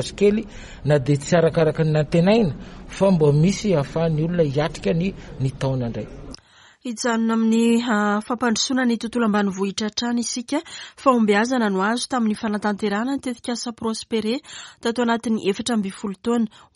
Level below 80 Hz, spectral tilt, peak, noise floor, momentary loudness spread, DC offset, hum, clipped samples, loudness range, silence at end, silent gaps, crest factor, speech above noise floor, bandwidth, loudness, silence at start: -46 dBFS; -5.5 dB/octave; -2 dBFS; -47 dBFS; 10 LU; under 0.1%; none; under 0.1%; 5 LU; 0.3 s; none; 18 dB; 27 dB; 11.5 kHz; -21 LUFS; 0 s